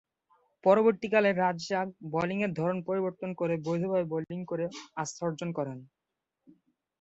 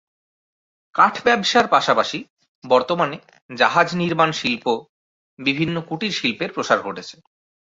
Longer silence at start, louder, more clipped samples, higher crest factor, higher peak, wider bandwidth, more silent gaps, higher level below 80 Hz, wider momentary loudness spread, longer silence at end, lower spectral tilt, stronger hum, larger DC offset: second, 0.65 s vs 0.95 s; second, -30 LUFS vs -19 LUFS; neither; about the same, 20 dB vs 20 dB; second, -10 dBFS vs -2 dBFS; about the same, 8.2 kHz vs 8 kHz; second, none vs 2.30-2.37 s, 2.48-2.62 s, 3.42-3.49 s, 4.89-5.37 s; second, -72 dBFS vs -62 dBFS; about the same, 11 LU vs 12 LU; first, 1.15 s vs 0.55 s; first, -6 dB/octave vs -4.5 dB/octave; neither; neither